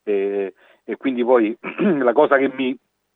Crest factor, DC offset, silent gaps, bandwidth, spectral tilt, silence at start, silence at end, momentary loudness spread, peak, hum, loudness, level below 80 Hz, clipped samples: 18 dB; under 0.1%; none; 4 kHz; -9 dB/octave; 0.05 s; 0.4 s; 12 LU; -2 dBFS; none; -19 LUFS; -80 dBFS; under 0.1%